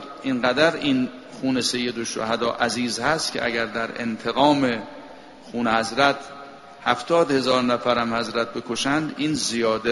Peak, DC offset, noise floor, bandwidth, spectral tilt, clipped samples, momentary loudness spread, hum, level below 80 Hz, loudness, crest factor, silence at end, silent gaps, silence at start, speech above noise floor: -2 dBFS; under 0.1%; -42 dBFS; 11.5 kHz; -3.5 dB/octave; under 0.1%; 11 LU; none; -56 dBFS; -22 LUFS; 20 dB; 0 s; none; 0 s; 20 dB